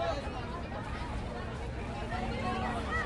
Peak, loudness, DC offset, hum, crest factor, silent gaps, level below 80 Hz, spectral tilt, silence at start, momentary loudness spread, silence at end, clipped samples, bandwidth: -20 dBFS; -37 LUFS; under 0.1%; none; 14 dB; none; -42 dBFS; -6 dB/octave; 0 s; 5 LU; 0 s; under 0.1%; 11.5 kHz